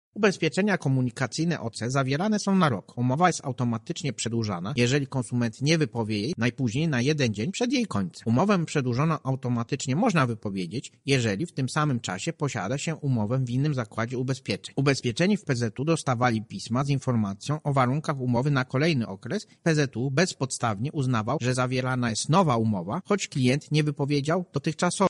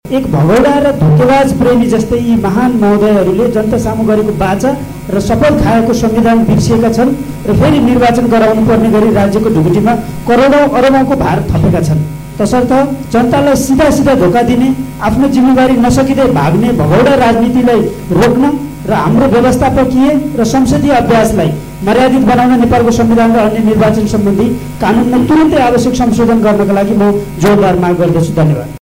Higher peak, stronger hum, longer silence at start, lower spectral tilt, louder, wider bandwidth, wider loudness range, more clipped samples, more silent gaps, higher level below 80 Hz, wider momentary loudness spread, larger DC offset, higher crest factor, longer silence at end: second, -8 dBFS vs -2 dBFS; neither; about the same, 0.15 s vs 0.05 s; second, -5.5 dB/octave vs -7 dB/octave; second, -26 LUFS vs -9 LUFS; second, 11.5 kHz vs 16.5 kHz; about the same, 2 LU vs 2 LU; neither; neither; second, -60 dBFS vs -28 dBFS; about the same, 6 LU vs 5 LU; second, under 0.1% vs 0.5%; first, 18 dB vs 8 dB; about the same, 0 s vs 0.05 s